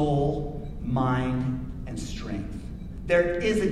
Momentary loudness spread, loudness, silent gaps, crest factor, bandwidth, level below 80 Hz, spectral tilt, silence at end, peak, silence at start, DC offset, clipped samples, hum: 13 LU; -28 LUFS; none; 16 dB; 12.5 kHz; -38 dBFS; -7 dB/octave; 0 s; -10 dBFS; 0 s; under 0.1%; under 0.1%; none